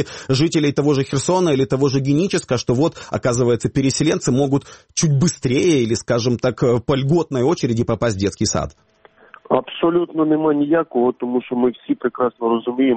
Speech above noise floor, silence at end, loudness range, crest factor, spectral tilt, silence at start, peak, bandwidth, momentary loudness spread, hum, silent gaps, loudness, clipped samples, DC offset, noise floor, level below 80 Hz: 29 dB; 0 s; 2 LU; 16 dB; -5.5 dB/octave; 0 s; -2 dBFS; 8.8 kHz; 4 LU; none; none; -18 LUFS; under 0.1%; under 0.1%; -47 dBFS; -46 dBFS